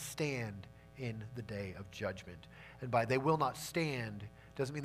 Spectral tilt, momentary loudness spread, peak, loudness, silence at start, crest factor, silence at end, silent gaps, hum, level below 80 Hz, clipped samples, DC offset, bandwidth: -5.5 dB/octave; 18 LU; -18 dBFS; -38 LUFS; 0 s; 20 dB; 0 s; none; none; -64 dBFS; under 0.1%; under 0.1%; 15.5 kHz